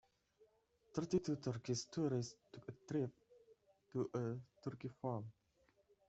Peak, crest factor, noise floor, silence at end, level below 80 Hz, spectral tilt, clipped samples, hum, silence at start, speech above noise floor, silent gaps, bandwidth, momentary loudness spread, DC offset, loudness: -26 dBFS; 20 dB; -77 dBFS; 0.75 s; -76 dBFS; -6.5 dB/octave; under 0.1%; none; 0.4 s; 34 dB; none; 8.2 kHz; 11 LU; under 0.1%; -44 LUFS